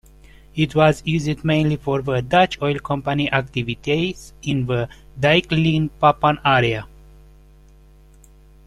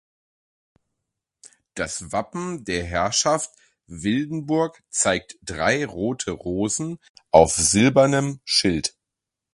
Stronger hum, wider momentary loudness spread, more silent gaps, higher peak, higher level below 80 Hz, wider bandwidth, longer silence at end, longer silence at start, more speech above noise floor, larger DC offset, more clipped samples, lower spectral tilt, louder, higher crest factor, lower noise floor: neither; second, 9 LU vs 14 LU; second, none vs 7.09-7.14 s; about the same, -2 dBFS vs 0 dBFS; about the same, -44 dBFS vs -46 dBFS; about the same, 12 kHz vs 11.5 kHz; first, 1.8 s vs 0.65 s; second, 0.55 s vs 1.45 s; second, 29 dB vs 64 dB; neither; neither; first, -6.5 dB/octave vs -3.5 dB/octave; first, -19 LUFS vs -22 LUFS; about the same, 18 dB vs 22 dB; second, -48 dBFS vs -85 dBFS